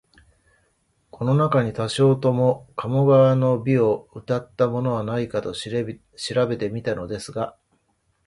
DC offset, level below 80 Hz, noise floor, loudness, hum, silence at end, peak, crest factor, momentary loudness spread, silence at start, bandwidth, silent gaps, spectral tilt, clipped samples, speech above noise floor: under 0.1%; -56 dBFS; -68 dBFS; -22 LUFS; none; 0.75 s; -6 dBFS; 16 dB; 11 LU; 1.15 s; 11.5 kHz; none; -7 dB/octave; under 0.1%; 47 dB